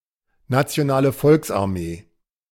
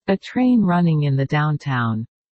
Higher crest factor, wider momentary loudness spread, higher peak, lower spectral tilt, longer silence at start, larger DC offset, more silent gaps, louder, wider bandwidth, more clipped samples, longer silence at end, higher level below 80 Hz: first, 18 dB vs 12 dB; first, 13 LU vs 6 LU; about the same, -4 dBFS vs -6 dBFS; second, -6.5 dB/octave vs -8.5 dB/octave; first, 0.5 s vs 0.05 s; neither; neither; about the same, -20 LUFS vs -19 LUFS; first, 17 kHz vs 7.6 kHz; neither; first, 0.5 s vs 0.3 s; about the same, -50 dBFS vs -54 dBFS